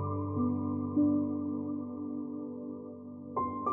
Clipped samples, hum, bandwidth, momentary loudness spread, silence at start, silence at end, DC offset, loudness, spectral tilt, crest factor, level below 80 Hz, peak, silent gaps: under 0.1%; none; 2.5 kHz; 13 LU; 0 s; 0 s; under 0.1%; -34 LUFS; -13.5 dB/octave; 14 dB; -70 dBFS; -18 dBFS; none